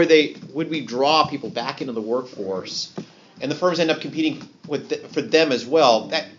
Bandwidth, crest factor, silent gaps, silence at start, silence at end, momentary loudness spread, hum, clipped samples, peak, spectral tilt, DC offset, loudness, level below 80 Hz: 7.6 kHz; 20 dB; none; 0 s; 0.05 s; 12 LU; none; under 0.1%; -2 dBFS; -2.5 dB/octave; under 0.1%; -22 LUFS; -70 dBFS